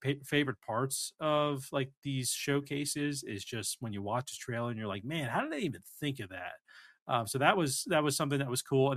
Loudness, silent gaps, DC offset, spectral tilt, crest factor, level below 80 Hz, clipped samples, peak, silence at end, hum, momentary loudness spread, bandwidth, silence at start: -33 LUFS; 1.97-2.02 s, 7.02-7.06 s; under 0.1%; -4 dB/octave; 24 dB; -70 dBFS; under 0.1%; -10 dBFS; 0 s; none; 9 LU; 15.5 kHz; 0 s